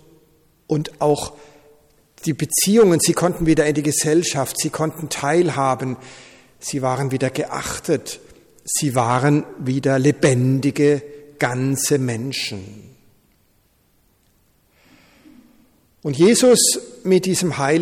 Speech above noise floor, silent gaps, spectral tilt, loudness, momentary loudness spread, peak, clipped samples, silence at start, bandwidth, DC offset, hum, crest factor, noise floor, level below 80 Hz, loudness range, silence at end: 42 dB; none; -4.5 dB/octave; -18 LUFS; 13 LU; -4 dBFS; under 0.1%; 0.7 s; 18 kHz; under 0.1%; none; 16 dB; -60 dBFS; -50 dBFS; 7 LU; 0 s